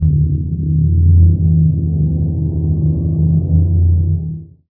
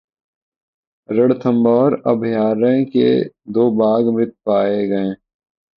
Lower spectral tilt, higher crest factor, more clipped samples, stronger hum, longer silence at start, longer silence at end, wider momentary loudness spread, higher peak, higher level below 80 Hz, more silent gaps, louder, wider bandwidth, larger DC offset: first, -17 dB/octave vs -10 dB/octave; about the same, 12 dB vs 16 dB; neither; neither; second, 0 s vs 1.1 s; second, 0.2 s vs 0.6 s; about the same, 7 LU vs 7 LU; about the same, -2 dBFS vs -2 dBFS; first, -22 dBFS vs -60 dBFS; neither; about the same, -14 LUFS vs -16 LUFS; second, 0.9 kHz vs 5.2 kHz; neither